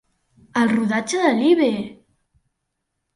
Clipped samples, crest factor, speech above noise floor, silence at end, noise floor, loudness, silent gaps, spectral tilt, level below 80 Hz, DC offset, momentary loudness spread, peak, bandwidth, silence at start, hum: under 0.1%; 16 dB; 59 dB; 1.25 s; -77 dBFS; -19 LUFS; none; -4.5 dB/octave; -64 dBFS; under 0.1%; 11 LU; -4 dBFS; 11.5 kHz; 0.55 s; none